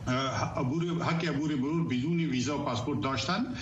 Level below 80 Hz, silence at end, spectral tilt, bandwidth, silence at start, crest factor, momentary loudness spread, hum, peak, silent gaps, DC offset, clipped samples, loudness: -54 dBFS; 0 s; -6 dB/octave; 8 kHz; 0 s; 14 dB; 2 LU; none; -16 dBFS; none; under 0.1%; under 0.1%; -30 LUFS